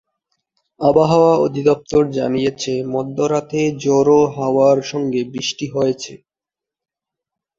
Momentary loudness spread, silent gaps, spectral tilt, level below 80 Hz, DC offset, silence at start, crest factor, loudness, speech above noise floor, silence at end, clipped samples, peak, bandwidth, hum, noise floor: 9 LU; none; -6 dB/octave; -52 dBFS; under 0.1%; 0.8 s; 16 dB; -17 LUFS; 72 dB; 1.45 s; under 0.1%; -2 dBFS; 7.6 kHz; none; -88 dBFS